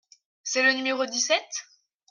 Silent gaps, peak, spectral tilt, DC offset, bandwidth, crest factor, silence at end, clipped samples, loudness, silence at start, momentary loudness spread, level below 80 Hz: none; -8 dBFS; 1 dB/octave; under 0.1%; 11 kHz; 18 dB; 0.5 s; under 0.1%; -24 LUFS; 0.45 s; 14 LU; -84 dBFS